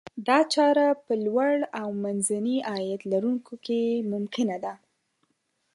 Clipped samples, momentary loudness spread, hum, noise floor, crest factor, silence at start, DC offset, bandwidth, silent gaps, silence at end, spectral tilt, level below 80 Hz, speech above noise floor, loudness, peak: under 0.1%; 10 LU; none; -74 dBFS; 18 dB; 0.15 s; under 0.1%; 11.5 kHz; none; 1 s; -4.5 dB/octave; -76 dBFS; 49 dB; -26 LUFS; -8 dBFS